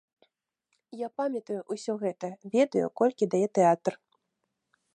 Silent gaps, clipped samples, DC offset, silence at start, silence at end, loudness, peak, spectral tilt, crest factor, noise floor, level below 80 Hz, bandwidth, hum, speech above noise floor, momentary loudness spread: none; under 0.1%; under 0.1%; 0.95 s; 1 s; -28 LUFS; -12 dBFS; -6.5 dB/octave; 18 dB; -81 dBFS; -82 dBFS; 11 kHz; none; 54 dB; 13 LU